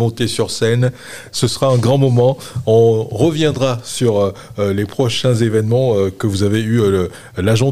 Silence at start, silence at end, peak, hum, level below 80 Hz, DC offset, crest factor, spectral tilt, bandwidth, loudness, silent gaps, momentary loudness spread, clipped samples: 0 s; 0 s; -2 dBFS; none; -48 dBFS; 1%; 14 dB; -6 dB/octave; 15 kHz; -16 LUFS; none; 7 LU; under 0.1%